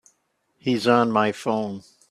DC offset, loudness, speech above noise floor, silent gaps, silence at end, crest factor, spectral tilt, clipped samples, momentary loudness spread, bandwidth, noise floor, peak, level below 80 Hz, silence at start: under 0.1%; -22 LUFS; 49 dB; none; 0.3 s; 20 dB; -6 dB/octave; under 0.1%; 13 LU; 12.5 kHz; -70 dBFS; -4 dBFS; -66 dBFS; 0.65 s